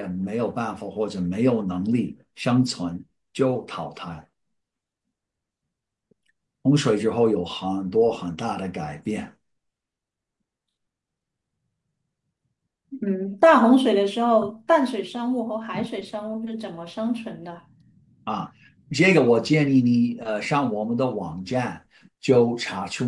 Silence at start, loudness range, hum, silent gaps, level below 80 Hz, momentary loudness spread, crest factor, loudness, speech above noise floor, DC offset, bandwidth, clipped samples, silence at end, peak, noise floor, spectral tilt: 0 s; 12 LU; none; none; -66 dBFS; 15 LU; 20 dB; -23 LUFS; 64 dB; under 0.1%; 11.5 kHz; under 0.1%; 0 s; -4 dBFS; -87 dBFS; -6.5 dB/octave